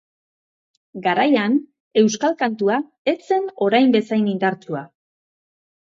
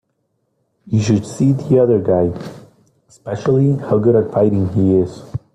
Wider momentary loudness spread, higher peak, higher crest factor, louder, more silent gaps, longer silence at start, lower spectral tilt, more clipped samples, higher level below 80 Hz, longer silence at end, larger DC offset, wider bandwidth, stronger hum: second, 9 LU vs 13 LU; about the same, -4 dBFS vs -2 dBFS; about the same, 18 dB vs 14 dB; second, -19 LUFS vs -16 LUFS; first, 1.80-1.91 s, 2.98-3.05 s vs none; about the same, 0.95 s vs 0.85 s; second, -5 dB/octave vs -8.5 dB/octave; neither; second, -72 dBFS vs -50 dBFS; first, 1.1 s vs 0.2 s; neither; second, 7.6 kHz vs 10.5 kHz; neither